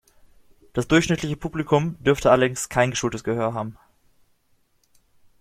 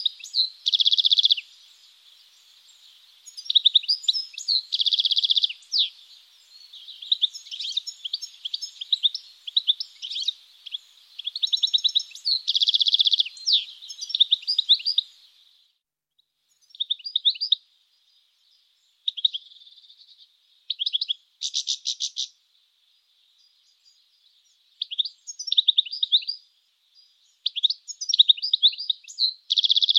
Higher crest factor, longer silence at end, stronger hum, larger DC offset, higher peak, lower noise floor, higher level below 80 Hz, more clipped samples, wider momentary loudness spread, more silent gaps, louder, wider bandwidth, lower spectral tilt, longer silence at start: about the same, 20 dB vs 24 dB; first, 1.7 s vs 0 s; neither; neither; about the same, -4 dBFS vs -4 dBFS; second, -64 dBFS vs -76 dBFS; first, -48 dBFS vs under -90 dBFS; neither; second, 11 LU vs 15 LU; neither; about the same, -22 LUFS vs -21 LUFS; first, 15.5 kHz vs 14 kHz; first, -5 dB/octave vs 9.5 dB/octave; first, 0.75 s vs 0 s